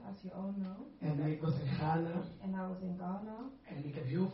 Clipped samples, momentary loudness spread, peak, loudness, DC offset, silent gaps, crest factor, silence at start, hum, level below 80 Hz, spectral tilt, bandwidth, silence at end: under 0.1%; 11 LU; -22 dBFS; -39 LUFS; under 0.1%; none; 16 dB; 0 s; none; -66 dBFS; -8 dB/octave; 5.8 kHz; 0 s